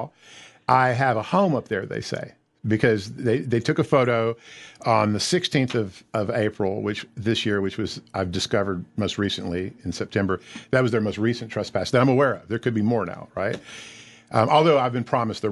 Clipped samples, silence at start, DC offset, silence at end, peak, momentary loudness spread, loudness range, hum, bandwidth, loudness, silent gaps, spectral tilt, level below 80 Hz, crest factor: under 0.1%; 0 s; under 0.1%; 0 s; -4 dBFS; 11 LU; 3 LU; none; 12 kHz; -23 LUFS; none; -5.5 dB/octave; -52 dBFS; 20 dB